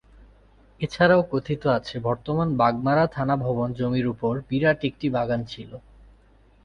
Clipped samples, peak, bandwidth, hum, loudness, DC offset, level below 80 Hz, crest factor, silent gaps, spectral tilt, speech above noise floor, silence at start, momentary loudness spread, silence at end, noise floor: under 0.1%; -6 dBFS; 9.8 kHz; none; -24 LUFS; under 0.1%; -50 dBFS; 18 dB; none; -8 dB/octave; 33 dB; 0.8 s; 12 LU; 0.85 s; -56 dBFS